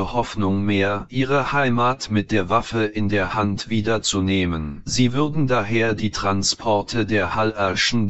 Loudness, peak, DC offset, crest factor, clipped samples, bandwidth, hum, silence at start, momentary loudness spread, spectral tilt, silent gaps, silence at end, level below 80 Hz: -21 LUFS; -4 dBFS; under 0.1%; 16 dB; under 0.1%; 8.2 kHz; none; 0 s; 4 LU; -5 dB/octave; none; 0 s; -42 dBFS